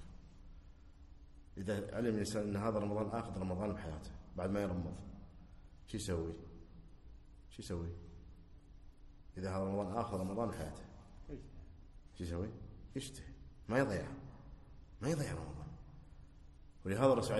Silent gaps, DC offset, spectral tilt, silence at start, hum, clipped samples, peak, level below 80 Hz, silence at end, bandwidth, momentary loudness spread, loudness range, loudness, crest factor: none; under 0.1%; -6.5 dB/octave; 0 s; none; under 0.1%; -18 dBFS; -56 dBFS; 0 s; 12 kHz; 24 LU; 7 LU; -40 LUFS; 24 dB